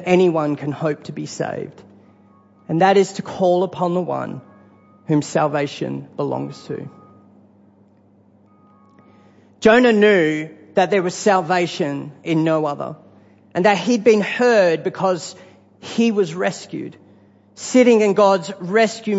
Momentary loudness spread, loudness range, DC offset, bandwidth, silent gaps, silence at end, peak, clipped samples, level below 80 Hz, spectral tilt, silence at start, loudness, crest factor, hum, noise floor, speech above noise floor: 17 LU; 7 LU; under 0.1%; 8 kHz; none; 0 s; -2 dBFS; under 0.1%; -62 dBFS; -5.5 dB/octave; 0 s; -18 LUFS; 18 dB; none; -53 dBFS; 35 dB